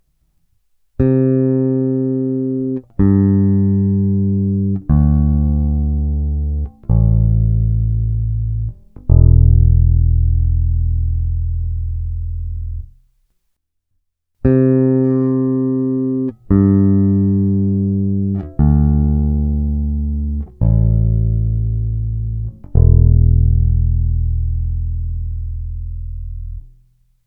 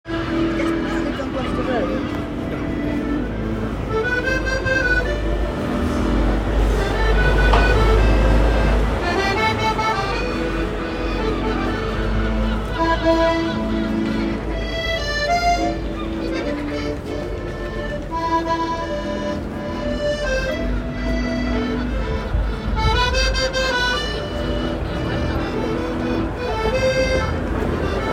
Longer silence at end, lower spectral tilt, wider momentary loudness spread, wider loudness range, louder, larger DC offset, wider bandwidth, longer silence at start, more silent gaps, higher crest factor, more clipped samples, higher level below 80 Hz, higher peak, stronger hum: first, 0.6 s vs 0 s; first, -15 dB/octave vs -5.5 dB/octave; first, 12 LU vs 7 LU; about the same, 6 LU vs 5 LU; first, -16 LUFS vs -21 LUFS; neither; second, 2.5 kHz vs 10.5 kHz; first, 1 s vs 0.05 s; neither; about the same, 14 dB vs 18 dB; neither; about the same, -20 dBFS vs -24 dBFS; about the same, 0 dBFS vs -2 dBFS; neither